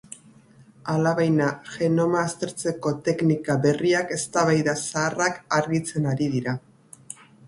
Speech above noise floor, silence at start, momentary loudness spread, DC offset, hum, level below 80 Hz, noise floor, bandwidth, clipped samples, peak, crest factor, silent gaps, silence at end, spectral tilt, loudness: 29 dB; 0.85 s; 11 LU; under 0.1%; none; -62 dBFS; -52 dBFS; 11.5 kHz; under 0.1%; -6 dBFS; 18 dB; none; 0.35 s; -5.5 dB/octave; -24 LUFS